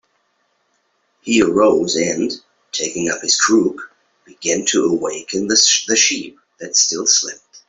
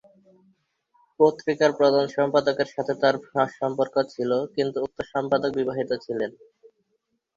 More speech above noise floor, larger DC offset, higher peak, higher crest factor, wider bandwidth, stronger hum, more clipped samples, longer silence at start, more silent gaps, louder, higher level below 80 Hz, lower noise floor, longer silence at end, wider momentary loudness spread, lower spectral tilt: about the same, 48 dB vs 51 dB; neither; first, 0 dBFS vs -6 dBFS; about the same, 18 dB vs 20 dB; about the same, 8.2 kHz vs 7.6 kHz; neither; neither; about the same, 1.25 s vs 1.2 s; neither; first, -16 LUFS vs -24 LUFS; first, -58 dBFS vs -66 dBFS; second, -65 dBFS vs -75 dBFS; second, 0.1 s vs 1.05 s; first, 14 LU vs 8 LU; second, -1.5 dB/octave vs -6 dB/octave